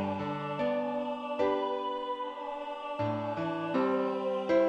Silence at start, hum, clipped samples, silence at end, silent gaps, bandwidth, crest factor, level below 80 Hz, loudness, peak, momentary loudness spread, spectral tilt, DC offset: 0 s; none; under 0.1%; 0 s; none; 8.6 kHz; 16 dB; -70 dBFS; -33 LUFS; -16 dBFS; 8 LU; -7.5 dB/octave; under 0.1%